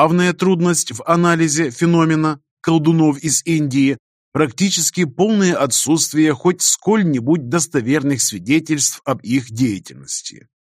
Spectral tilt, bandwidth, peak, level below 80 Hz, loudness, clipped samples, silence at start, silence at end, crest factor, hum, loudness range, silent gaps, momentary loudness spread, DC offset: -4.5 dB/octave; 15.5 kHz; 0 dBFS; -58 dBFS; -16 LUFS; under 0.1%; 0 s; 0.4 s; 16 dB; none; 2 LU; 2.51-2.57 s, 3.99-4.32 s; 7 LU; under 0.1%